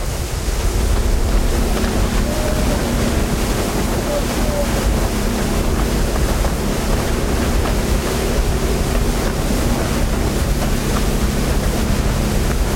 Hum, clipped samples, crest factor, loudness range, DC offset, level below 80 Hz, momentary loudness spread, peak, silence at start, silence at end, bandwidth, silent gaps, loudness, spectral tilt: none; under 0.1%; 12 dB; 0 LU; under 0.1%; -20 dBFS; 1 LU; -4 dBFS; 0 s; 0 s; 16.5 kHz; none; -19 LUFS; -5 dB/octave